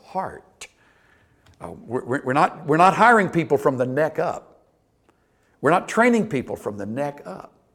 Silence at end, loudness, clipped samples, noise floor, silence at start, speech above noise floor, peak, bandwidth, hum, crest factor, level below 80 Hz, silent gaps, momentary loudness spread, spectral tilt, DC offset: 0.3 s; -21 LUFS; under 0.1%; -63 dBFS; 0.15 s; 42 dB; -2 dBFS; 16.5 kHz; none; 20 dB; -60 dBFS; none; 24 LU; -6 dB/octave; under 0.1%